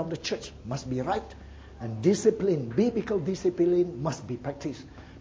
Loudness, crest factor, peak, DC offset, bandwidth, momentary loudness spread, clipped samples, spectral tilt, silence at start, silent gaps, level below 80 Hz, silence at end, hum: -28 LUFS; 18 dB; -10 dBFS; under 0.1%; 8 kHz; 16 LU; under 0.1%; -6.5 dB/octave; 0 s; none; -52 dBFS; 0 s; none